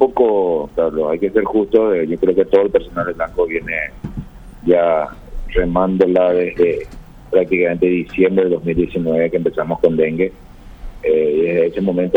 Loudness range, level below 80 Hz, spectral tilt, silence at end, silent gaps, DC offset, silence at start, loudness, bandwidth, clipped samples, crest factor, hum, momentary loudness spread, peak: 2 LU; -34 dBFS; -9 dB/octave; 0 s; none; under 0.1%; 0 s; -16 LUFS; 4.9 kHz; under 0.1%; 16 dB; none; 9 LU; 0 dBFS